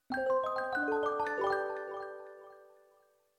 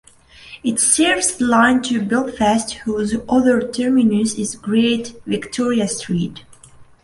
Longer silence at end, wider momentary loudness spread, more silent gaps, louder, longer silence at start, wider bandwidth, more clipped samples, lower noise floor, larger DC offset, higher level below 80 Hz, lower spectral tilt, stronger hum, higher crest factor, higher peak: first, 0.75 s vs 0.2 s; first, 18 LU vs 10 LU; neither; second, -34 LUFS vs -17 LUFS; second, 0.1 s vs 0.45 s; first, 14.5 kHz vs 11.5 kHz; neither; first, -68 dBFS vs -44 dBFS; neither; second, -74 dBFS vs -48 dBFS; first, -5 dB/octave vs -3.5 dB/octave; neither; about the same, 16 dB vs 18 dB; second, -20 dBFS vs -2 dBFS